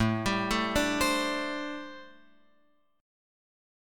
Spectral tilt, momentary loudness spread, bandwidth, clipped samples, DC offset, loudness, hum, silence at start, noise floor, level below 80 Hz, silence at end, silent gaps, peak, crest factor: -4 dB/octave; 15 LU; 17.5 kHz; under 0.1%; under 0.1%; -29 LUFS; none; 0 s; -70 dBFS; -50 dBFS; 1 s; none; -12 dBFS; 20 dB